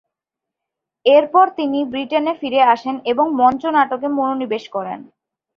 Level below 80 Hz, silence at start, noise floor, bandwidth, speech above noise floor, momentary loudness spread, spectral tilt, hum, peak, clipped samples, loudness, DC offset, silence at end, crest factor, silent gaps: -62 dBFS; 1.05 s; -84 dBFS; 6.6 kHz; 68 dB; 10 LU; -6 dB/octave; none; -2 dBFS; under 0.1%; -17 LUFS; under 0.1%; 0.55 s; 16 dB; none